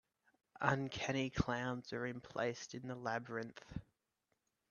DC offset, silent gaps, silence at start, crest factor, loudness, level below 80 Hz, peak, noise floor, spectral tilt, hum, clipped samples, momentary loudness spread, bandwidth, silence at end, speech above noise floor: under 0.1%; none; 0.55 s; 24 dB; -41 LUFS; -62 dBFS; -18 dBFS; -86 dBFS; -5.5 dB/octave; none; under 0.1%; 11 LU; 7.2 kHz; 0.9 s; 45 dB